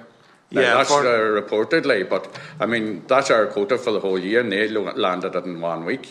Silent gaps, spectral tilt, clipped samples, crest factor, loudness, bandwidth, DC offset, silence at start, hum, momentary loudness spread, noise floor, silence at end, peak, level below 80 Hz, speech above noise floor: none; -4 dB/octave; under 0.1%; 18 dB; -20 LUFS; 11.5 kHz; under 0.1%; 0 s; none; 10 LU; -50 dBFS; 0 s; -2 dBFS; -70 dBFS; 30 dB